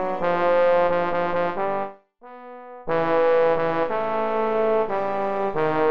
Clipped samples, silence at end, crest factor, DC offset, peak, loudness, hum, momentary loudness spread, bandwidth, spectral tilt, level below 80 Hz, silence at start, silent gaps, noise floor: under 0.1%; 0 s; 12 dB; 2%; -10 dBFS; -22 LUFS; none; 14 LU; 6 kHz; -7.5 dB/octave; -56 dBFS; 0 s; none; -45 dBFS